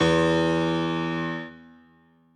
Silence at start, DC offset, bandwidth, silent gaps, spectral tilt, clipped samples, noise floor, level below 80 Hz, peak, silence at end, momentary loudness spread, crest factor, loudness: 0 s; under 0.1%; 9.4 kHz; none; -6 dB/octave; under 0.1%; -59 dBFS; -50 dBFS; -10 dBFS; 0.75 s; 13 LU; 16 dB; -24 LUFS